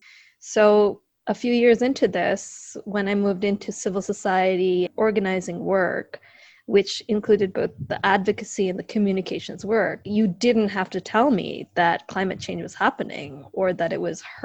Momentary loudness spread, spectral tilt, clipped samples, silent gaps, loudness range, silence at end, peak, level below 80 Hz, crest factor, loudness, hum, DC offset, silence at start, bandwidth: 11 LU; -5 dB/octave; under 0.1%; none; 2 LU; 0 s; -4 dBFS; -60 dBFS; 20 dB; -23 LUFS; none; under 0.1%; 0.45 s; 8.8 kHz